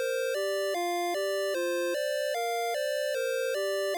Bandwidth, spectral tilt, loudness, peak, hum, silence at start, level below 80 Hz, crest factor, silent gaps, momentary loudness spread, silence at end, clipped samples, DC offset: 19 kHz; 0.5 dB/octave; -30 LUFS; -26 dBFS; none; 0 s; under -90 dBFS; 4 dB; none; 0 LU; 0 s; under 0.1%; under 0.1%